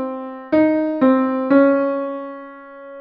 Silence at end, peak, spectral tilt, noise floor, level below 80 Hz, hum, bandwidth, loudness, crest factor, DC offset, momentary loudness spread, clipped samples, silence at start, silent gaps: 0 s; -2 dBFS; -9 dB/octave; -37 dBFS; -62 dBFS; none; 5.2 kHz; -17 LUFS; 16 dB; under 0.1%; 22 LU; under 0.1%; 0 s; none